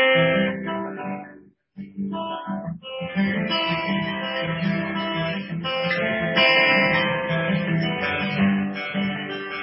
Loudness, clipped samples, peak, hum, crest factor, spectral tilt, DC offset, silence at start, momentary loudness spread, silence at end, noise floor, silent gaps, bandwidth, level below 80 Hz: -23 LUFS; under 0.1%; -6 dBFS; none; 18 dB; -10 dB/octave; under 0.1%; 0 s; 14 LU; 0 s; -49 dBFS; none; 5.8 kHz; -54 dBFS